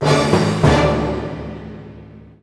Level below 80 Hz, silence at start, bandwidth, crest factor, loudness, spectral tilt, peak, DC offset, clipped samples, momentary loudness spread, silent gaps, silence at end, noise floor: -32 dBFS; 0 s; 11 kHz; 18 dB; -16 LUFS; -6 dB/octave; 0 dBFS; under 0.1%; under 0.1%; 21 LU; none; 0.25 s; -39 dBFS